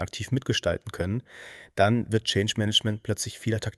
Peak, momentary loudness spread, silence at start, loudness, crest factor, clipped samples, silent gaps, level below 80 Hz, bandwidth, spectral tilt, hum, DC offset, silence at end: -8 dBFS; 10 LU; 0 s; -26 LUFS; 20 dB; under 0.1%; none; -52 dBFS; 12 kHz; -4.5 dB/octave; none; under 0.1%; 0.05 s